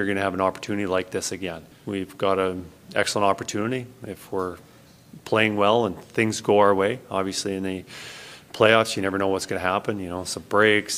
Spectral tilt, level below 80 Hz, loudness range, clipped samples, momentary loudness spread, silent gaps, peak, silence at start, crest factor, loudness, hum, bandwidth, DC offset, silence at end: -4 dB/octave; -60 dBFS; 4 LU; under 0.1%; 17 LU; none; -2 dBFS; 0 s; 22 dB; -24 LUFS; none; 16 kHz; under 0.1%; 0 s